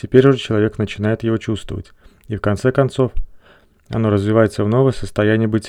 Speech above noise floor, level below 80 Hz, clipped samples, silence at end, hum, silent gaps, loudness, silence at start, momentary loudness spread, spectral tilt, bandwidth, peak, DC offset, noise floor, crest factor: 34 dB; -34 dBFS; under 0.1%; 0 s; none; none; -17 LUFS; 0.05 s; 11 LU; -7.5 dB/octave; 11.5 kHz; 0 dBFS; under 0.1%; -51 dBFS; 18 dB